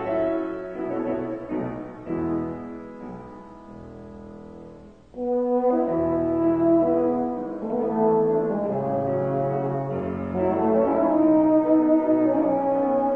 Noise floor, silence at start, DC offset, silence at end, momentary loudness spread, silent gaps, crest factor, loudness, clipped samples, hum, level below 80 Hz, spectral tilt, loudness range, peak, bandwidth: -45 dBFS; 0 s; 0.1%; 0 s; 22 LU; none; 14 dB; -23 LUFS; under 0.1%; none; -54 dBFS; -11 dB/octave; 12 LU; -8 dBFS; 3.5 kHz